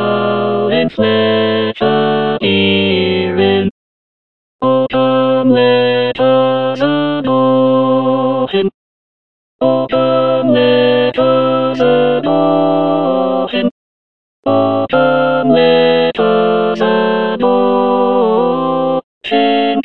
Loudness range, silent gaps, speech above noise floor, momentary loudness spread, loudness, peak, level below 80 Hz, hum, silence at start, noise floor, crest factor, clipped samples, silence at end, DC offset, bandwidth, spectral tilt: 2 LU; 3.71-4.59 s, 8.74-9.59 s, 13.71-14.43 s, 19.04-19.21 s; over 78 dB; 4 LU; -12 LUFS; 0 dBFS; -56 dBFS; none; 0 s; under -90 dBFS; 12 dB; under 0.1%; 0 s; 1%; 5.8 kHz; -8 dB/octave